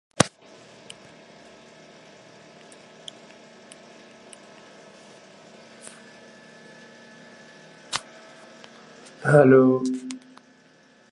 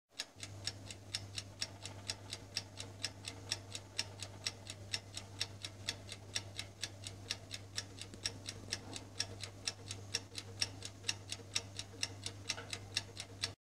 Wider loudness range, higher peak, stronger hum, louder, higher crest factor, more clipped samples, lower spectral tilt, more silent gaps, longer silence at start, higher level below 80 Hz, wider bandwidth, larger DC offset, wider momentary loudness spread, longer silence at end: first, 24 LU vs 3 LU; first, 0 dBFS vs -16 dBFS; neither; first, -20 LUFS vs -43 LUFS; about the same, 28 dB vs 30 dB; neither; first, -5.5 dB/octave vs -2 dB/octave; neither; first, 0.2 s vs 0.05 s; about the same, -64 dBFS vs -68 dBFS; second, 11.5 kHz vs 16 kHz; neither; first, 30 LU vs 7 LU; first, 0.95 s vs 0.1 s